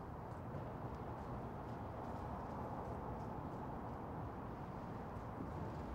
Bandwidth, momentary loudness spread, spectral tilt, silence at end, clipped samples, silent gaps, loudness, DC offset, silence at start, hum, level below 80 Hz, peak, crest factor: 16 kHz; 2 LU; -8.5 dB/octave; 0 s; under 0.1%; none; -48 LUFS; under 0.1%; 0 s; none; -58 dBFS; -34 dBFS; 14 dB